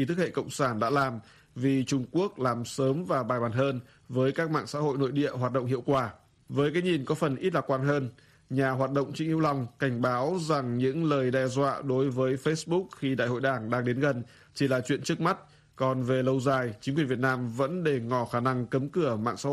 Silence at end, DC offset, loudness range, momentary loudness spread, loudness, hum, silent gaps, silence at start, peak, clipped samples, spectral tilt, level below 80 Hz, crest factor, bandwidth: 0 s; under 0.1%; 1 LU; 4 LU; -29 LUFS; none; none; 0 s; -12 dBFS; under 0.1%; -6.5 dB/octave; -64 dBFS; 16 dB; 13 kHz